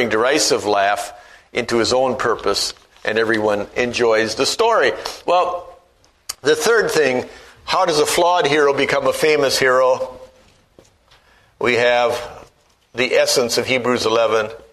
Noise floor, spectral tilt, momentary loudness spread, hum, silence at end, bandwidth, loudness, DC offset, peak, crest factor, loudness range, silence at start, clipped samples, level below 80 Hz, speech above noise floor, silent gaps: -55 dBFS; -2.5 dB/octave; 10 LU; none; 0.15 s; 13.5 kHz; -17 LUFS; under 0.1%; 0 dBFS; 18 dB; 3 LU; 0 s; under 0.1%; -52 dBFS; 38 dB; none